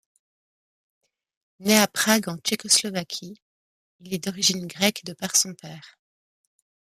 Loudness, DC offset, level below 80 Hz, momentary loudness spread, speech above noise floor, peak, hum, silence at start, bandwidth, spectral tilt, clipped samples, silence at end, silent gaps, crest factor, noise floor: -22 LUFS; under 0.1%; -70 dBFS; 15 LU; over 66 dB; -2 dBFS; none; 1.6 s; 15.5 kHz; -2 dB/octave; under 0.1%; 1.1 s; 3.42-3.99 s; 24 dB; under -90 dBFS